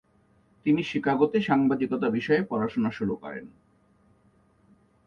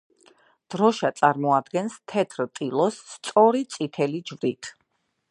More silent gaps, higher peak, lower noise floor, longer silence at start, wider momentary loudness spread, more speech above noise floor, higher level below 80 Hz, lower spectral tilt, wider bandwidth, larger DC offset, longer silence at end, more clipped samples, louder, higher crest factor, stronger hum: neither; second, -8 dBFS vs -2 dBFS; second, -63 dBFS vs -73 dBFS; about the same, 0.65 s vs 0.7 s; about the same, 9 LU vs 11 LU; second, 38 dB vs 49 dB; first, -62 dBFS vs -76 dBFS; first, -7.5 dB/octave vs -5.5 dB/octave; second, 7 kHz vs 11 kHz; neither; first, 1.6 s vs 0.6 s; neither; about the same, -26 LUFS vs -24 LUFS; about the same, 20 dB vs 22 dB; neither